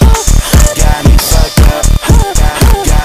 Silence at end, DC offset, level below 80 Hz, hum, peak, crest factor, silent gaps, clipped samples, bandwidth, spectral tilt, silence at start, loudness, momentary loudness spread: 0 s; under 0.1%; -8 dBFS; none; 0 dBFS; 6 dB; none; 2%; 16 kHz; -4.5 dB/octave; 0 s; -9 LUFS; 2 LU